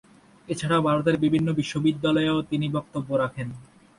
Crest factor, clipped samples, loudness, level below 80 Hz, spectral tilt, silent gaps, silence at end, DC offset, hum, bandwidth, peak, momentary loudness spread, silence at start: 16 dB; under 0.1%; -24 LUFS; -56 dBFS; -6.5 dB/octave; none; 0.35 s; under 0.1%; none; 11.5 kHz; -10 dBFS; 11 LU; 0.5 s